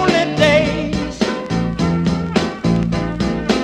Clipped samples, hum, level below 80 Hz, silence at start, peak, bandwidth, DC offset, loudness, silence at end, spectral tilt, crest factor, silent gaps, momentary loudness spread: under 0.1%; none; -34 dBFS; 0 s; 0 dBFS; 10.5 kHz; under 0.1%; -17 LUFS; 0 s; -6 dB/octave; 16 dB; none; 7 LU